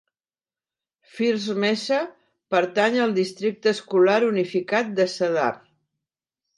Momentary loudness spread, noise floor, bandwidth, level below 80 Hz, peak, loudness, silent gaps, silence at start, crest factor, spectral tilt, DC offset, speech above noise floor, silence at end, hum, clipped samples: 7 LU; under -90 dBFS; 11.5 kHz; -76 dBFS; -8 dBFS; -22 LUFS; none; 1.15 s; 16 dB; -5 dB/octave; under 0.1%; over 68 dB; 1 s; none; under 0.1%